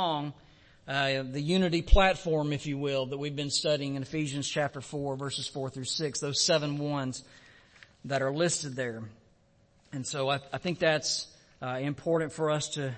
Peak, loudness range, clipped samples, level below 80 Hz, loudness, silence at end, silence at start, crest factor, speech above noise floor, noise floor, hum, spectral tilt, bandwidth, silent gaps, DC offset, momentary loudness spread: -6 dBFS; 5 LU; under 0.1%; -40 dBFS; -30 LUFS; 0 s; 0 s; 24 dB; 35 dB; -64 dBFS; none; -4 dB/octave; 8.8 kHz; none; under 0.1%; 11 LU